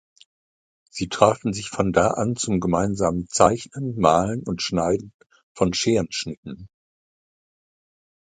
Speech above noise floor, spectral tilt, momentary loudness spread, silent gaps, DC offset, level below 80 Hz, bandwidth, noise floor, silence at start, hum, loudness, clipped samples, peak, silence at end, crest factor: over 68 dB; -5 dB/octave; 12 LU; 5.14-5.19 s, 5.43-5.55 s, 6.37-6.43 s; under 0.1%; -48 dBFS; 9.6 kHz; under -90 dBFS; 0.95 s; none; -22 LUFS; under 0.1%; -2 dBFS; 1.65 s; 22 dB